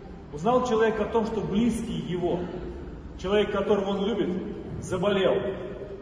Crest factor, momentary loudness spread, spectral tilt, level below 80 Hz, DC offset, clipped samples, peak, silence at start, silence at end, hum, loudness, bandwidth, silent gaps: 16 dB; 13 LU; -6.5 dB/octave; -46 dBFS; under 0.1%; under 0.1%; -10 dBFS; 0 s; 0 s; none; -27 LUFS; 10.5 kHz; none